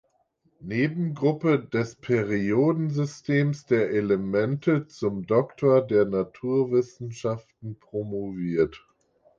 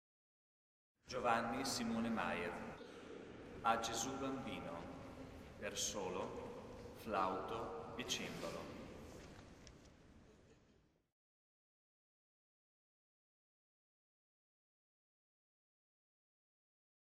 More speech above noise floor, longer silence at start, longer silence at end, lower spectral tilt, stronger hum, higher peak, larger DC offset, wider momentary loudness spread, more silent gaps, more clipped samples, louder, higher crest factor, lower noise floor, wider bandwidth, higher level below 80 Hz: first, 44 dB vs 32 dB; second, 0.6 s vs 1.05 s; second, 0.6 s vs 6.5 s; first, -8 dB/octave vs -3.5 dB/octave; neither; first, -10 dBFS vs -20 dBFS; neither; second, 9 LU vs 17 LU; neither; neither; first, -25 LUFS vs -43 LUFS; second, 16 dB vs 26 dB; second, -68 dBFS vs -74 dBFS; second, 7.6 kHz vs 15.5 kHz; first, -60 dBFS vs -68 dBFS